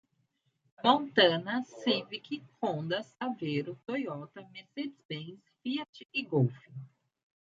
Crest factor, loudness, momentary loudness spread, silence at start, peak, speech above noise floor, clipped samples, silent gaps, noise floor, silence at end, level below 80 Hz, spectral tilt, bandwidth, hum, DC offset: 24 dB; -32 LUFS; 19 LU; 0.8 s; -8 dBFS; 44 dB; under 0.1%; 5.05-5.09 s, 5.89-5.93 s; -77 dBFS; 0.55 s; -80 dBFS; -6.5 dB/octave; 7.6 kHz; none; under 0.1%